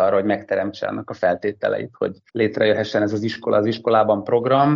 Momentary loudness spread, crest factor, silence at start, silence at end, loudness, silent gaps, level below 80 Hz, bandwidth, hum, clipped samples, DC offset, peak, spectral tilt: 8 LU; 16 dB; 0 s; 0 s; -21 LUFS; none; -62 dBFS; 7.4 kHz; none; under 0.1%; under 0.1%; -4 dBFS; -5 dB/octave